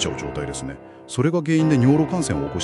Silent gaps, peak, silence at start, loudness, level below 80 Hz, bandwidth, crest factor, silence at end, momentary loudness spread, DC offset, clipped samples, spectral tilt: none; -4 dBFS; 0 s; -21 LUFS; -44 dBFS; 11.5 kHz; 16 dB; 0 s; 14 LU; under 0.1%; under 0.1%; -6 dB/octave